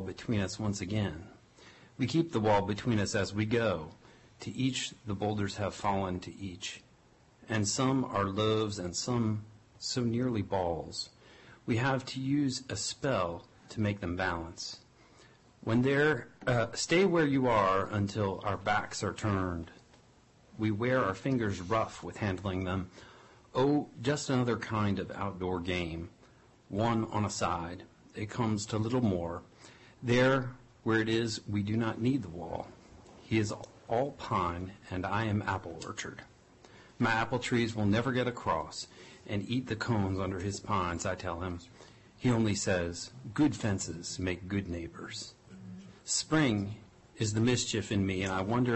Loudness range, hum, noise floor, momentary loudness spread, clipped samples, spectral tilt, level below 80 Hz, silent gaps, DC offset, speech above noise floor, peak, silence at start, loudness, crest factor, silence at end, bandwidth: 5 LU; none; -62 dBFS; 13 LU; under 0.1%; -5 dB/octave; -54 dBFS; none; under 0.1%; 31 dB; -16 dBFS; 0 s; -32 LUFS; 16 dB; 0 s; 8.6 kHz